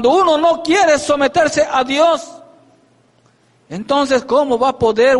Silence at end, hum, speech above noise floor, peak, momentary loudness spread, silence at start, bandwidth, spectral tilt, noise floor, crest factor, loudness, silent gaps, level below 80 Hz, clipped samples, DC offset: 0 s; none; 41 dB; -2 dBFS; 7 LU; 0 s; 11.5 kHz; -3.5 dB/octave; -54 dBFS; 12 dB; -14 LUFS; none; -50 dBFS; under 0.1%; under 0.1%